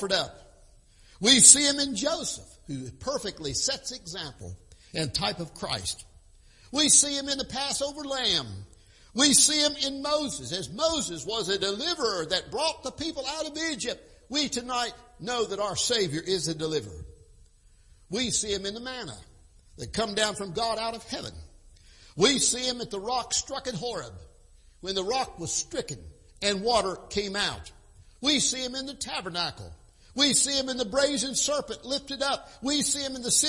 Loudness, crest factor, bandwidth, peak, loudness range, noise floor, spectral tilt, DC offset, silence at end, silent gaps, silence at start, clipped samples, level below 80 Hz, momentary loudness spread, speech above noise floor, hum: -26 LUFS; 28 dB; 11.5 kHz; 0 dBFS; 9 LU; -57 dBFS; -1.5 dB/octave; under 0.1%; 0 s; none; 0 s; under 0.1%; -54 dBFS; 16 LU; 29 dB; none